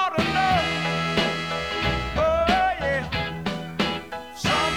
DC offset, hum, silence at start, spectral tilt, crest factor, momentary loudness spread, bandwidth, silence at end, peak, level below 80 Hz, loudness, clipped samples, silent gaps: 0.2%; none; 0 s; -4.5 dB/octave; 16 dB; 8 LU; 18.5 kHz; 0 s; -8 dBFS; -40 dBFS; -24 LUFS; under 0.1%; none